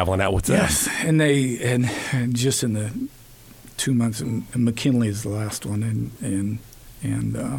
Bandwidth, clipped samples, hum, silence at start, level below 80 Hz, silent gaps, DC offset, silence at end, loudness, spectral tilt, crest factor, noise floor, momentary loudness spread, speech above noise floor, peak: 18 kHz; under 0.1%; none; 0 s; -44 dBFS; none; under 0.1%; 0 s; -23 LUFS; -5 dB/octave; 16 dB; -46 dBFS; 10 LU; 24 dB; -6 dBFS